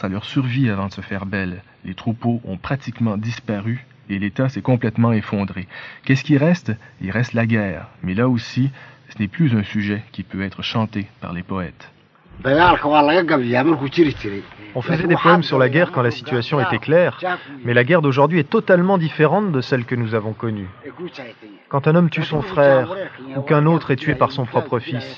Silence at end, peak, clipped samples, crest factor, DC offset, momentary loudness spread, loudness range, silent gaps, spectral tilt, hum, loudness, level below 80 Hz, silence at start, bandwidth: 0 s; 0 dBFS; under 0.1%; 18 dB; under 0.1%; 14 LU; 7 LU; none; -8 dB/octave; none; -19 LUFS; -50 dBFS; 0 s; 7 kHz